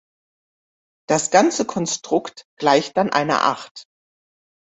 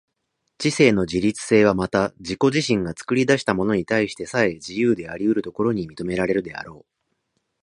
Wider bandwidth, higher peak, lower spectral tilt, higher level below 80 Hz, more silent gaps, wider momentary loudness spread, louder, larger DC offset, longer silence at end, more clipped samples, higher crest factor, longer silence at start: second, 8.4 kHz vs 11 kHz; about the same, -2 dBFS vs 0 dBFS; second, -3.5 dB/octave vs -5.5 dB/octave; second, -64 dBFS vs -50 dBFS; first, 2.45-2.57 s, 3.71-3.75 s vs none; about the same, 9 LU vs 8 LU; about the same, -19 LUFS vs -21 LUFS; neither; about the same, 0.85 s vs 0.85 s; neither; about the same, 20 dB vs 20 dB; first, 1.1 s vs 0.6 s